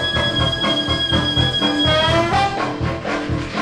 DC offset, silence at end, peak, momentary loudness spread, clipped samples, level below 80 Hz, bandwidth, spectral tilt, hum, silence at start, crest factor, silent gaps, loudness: under 0.1%; 0 s; -4 dBFS; 7 LU; under 0.1%; -34 dBFS; 12 kHz; -5 dB/octave; none; 0 s; 14 dB; none; -17 LUFS